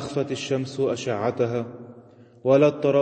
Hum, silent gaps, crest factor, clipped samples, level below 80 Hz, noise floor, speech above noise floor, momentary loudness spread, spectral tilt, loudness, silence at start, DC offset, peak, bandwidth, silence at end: none; none; 16 dB; under 0.1%; -64 dBFS; -49 dBFS; 27 dB; 12 LU; -6.5 dB/octave; -24 LUFS; 0 s; under 0.1%; -6 dBFS; 8.8 kHz; 0 s